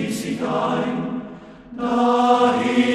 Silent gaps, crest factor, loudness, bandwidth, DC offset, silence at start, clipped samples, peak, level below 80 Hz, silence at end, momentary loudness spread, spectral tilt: none; 16 dB; -20 LUFS; 13.5 kHz; under 0.1%; 0 s; under 0.1%; -4 dBFS; -56 dBFS; 0 s; 18 LU; -5.5 dB/octave